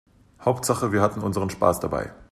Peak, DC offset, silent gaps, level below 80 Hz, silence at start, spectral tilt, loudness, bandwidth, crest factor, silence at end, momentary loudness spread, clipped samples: -4 dBFS; under 0.1%; none; -50 dBFS; 0.4 s; -5.5 dB/octave; -24 LUFS; 14 kHz; 20 dB; 0.1 s; 6 LU; under 0.1%